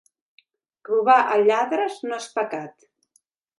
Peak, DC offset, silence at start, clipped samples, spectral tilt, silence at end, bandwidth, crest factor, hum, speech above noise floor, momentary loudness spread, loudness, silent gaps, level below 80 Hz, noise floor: -6 dBFS; under 0.1%; 0.9 s; under 0.1%; -4 dB/octave; 0.9 s; 11.5 kHz; 18 dB; none; 46 dB; 14 LU; -21 LUFS; none; -82 dBFS; -67 dBFS